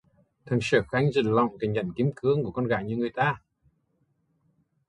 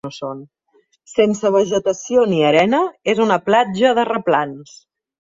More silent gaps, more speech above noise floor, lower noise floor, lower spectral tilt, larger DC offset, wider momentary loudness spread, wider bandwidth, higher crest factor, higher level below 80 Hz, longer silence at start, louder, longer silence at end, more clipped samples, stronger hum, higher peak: neither; first, 46 dB vs 41 dB; first, -72 dBFS vs -58 dBFS; first, -7 dB/octave vs -5 dB/octave; neither; second, 6 LU vs 14 LU; first, 11 kHz vs 7.8 kHz; about the same, 20 dB vs 16 dB; about the same, -58 dBFS vs -60 dBFS; first, 0.45 s vs 0.05 s; second, -26 LUFS vs -16 LUFS; first, 1.5 s vs 0.7 s; neither; neither; second, -8 dBFS vs -2 dBFS